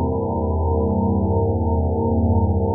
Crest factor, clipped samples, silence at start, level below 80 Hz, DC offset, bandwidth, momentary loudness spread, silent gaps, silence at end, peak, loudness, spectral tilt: 10 dB; under 0.1%; 0 s; -28 dBFS; under 0.1%; 1.1 kHz; 3 LU; none; 0 s; -8 dBFS; -20 LUFS; -5.5 dB/octave